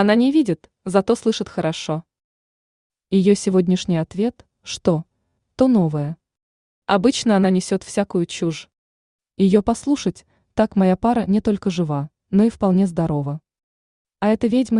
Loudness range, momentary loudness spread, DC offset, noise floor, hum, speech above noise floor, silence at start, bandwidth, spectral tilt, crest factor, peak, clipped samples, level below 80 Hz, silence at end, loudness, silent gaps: 2 LU; 11 LU; under 0.1%; -50 dBFS; none; 32 dB; 0 s; 11 kHz; -6.5 dB/octave; 16 dB; -2 dBFS; under 0.1%; -50 dBFS; 0 s; -20 LUFS; 2.24-2.90 s, 6.43-6.82 s, 8.78-9.19 s, 13.63-14.05 s